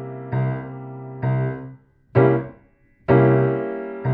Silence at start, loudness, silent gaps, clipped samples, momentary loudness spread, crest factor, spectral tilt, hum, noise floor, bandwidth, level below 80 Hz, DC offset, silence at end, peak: 0 s; -21 LUFS; none; under 0.1%; 18 LU; 20 dB; -12 dB/octave; none; -56 dBFS; 4 kHz; -52 dBFS; under 0.1%; 0 s; -2 dBFS